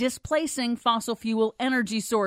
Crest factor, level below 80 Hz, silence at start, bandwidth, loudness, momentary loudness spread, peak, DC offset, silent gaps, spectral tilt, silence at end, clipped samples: 16 dB; -58 dBFS; 0 s; 16 kHz; -26 LUFS; 3 LU; -10 dBFS; under 0.1%; none; -3.5 dB/octave; 0 s; under 0.1%